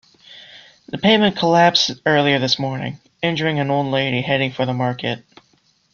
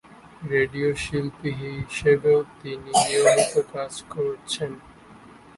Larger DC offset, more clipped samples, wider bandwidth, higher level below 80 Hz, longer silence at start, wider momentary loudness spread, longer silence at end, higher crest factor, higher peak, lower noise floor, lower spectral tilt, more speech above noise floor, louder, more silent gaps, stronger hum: neither; neither; second, 7.2 kHz vs 11.5 kHz; second, -58 dBFS vs -52 dBFS; first, 0.3 s vs 0.1 s; second, 11 LU vs 15 LU; first, 0.75 s vs 0.45 s; about the same, 18 dB vs 20 dB; about the same, -2 dBFS vs -4 dBFS; first, -60 dBFS vs -48 dBFS; about the same, -5 dB/octave vs -4 dB/octave; first, 42 dB vs 24 dB; first, -18 LUFS vs -23 LUFS; neither; neither